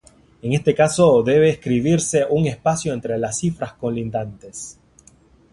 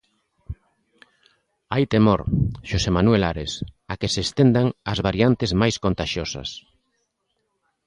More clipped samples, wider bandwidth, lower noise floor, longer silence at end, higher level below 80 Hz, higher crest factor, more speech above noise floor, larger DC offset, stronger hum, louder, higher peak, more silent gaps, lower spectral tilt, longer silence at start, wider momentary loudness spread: neither; about the same, 11.5 kHz vs 10.5 kHz; second, -52 dBFS vs -74 dBFS; second, 0.8 s vs 1.3 s; second, -50 dBFS vs -38 dBFS; about the same, 16 dB vs 18 dB; second, 34 dB vs 53 dB; neither; neither; about the same, -19 LUFS vs -21 LUFS; about the same, -2 dBFS vs -4 dBFS; neither; about the same, -5.5 dB/octave vs -6 dB/octave; about the same, 0.45 s vs 0.5 s; about the same, 17 LU vs 15 LU